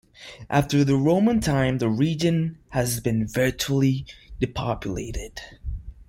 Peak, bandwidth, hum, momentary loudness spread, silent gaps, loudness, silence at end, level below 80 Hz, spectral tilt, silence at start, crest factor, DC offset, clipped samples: -8 dBFS; 16.5 kHz; none; 17 LU; none; -23 LUFS; 0.05 s; -40 dBFS; -6 dB/octave; 0.2 s; 16 dB; under 0.1%; under 0.1%